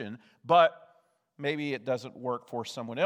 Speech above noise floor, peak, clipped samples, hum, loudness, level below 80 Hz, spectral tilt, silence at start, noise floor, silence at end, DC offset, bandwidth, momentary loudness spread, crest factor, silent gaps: 37 dB; -10 dBFS; under 0.1%; none; -29 LUFS; -84 dBFS; -5.5 dB/octave; 0 s; -67 dBFS; 0 s; under 0.1%; 12 kHz; 14 LU; 20 dB; none